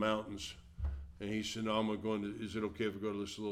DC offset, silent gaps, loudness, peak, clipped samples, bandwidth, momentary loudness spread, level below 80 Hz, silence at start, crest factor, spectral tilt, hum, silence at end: under 0.1%; none; -39 LUFS; -20 dBFS; under 0.1%; 15 kHz; 9 LU; -50 dBFS; 0 s; 18 dB; -5 dB/octave; none; 0 s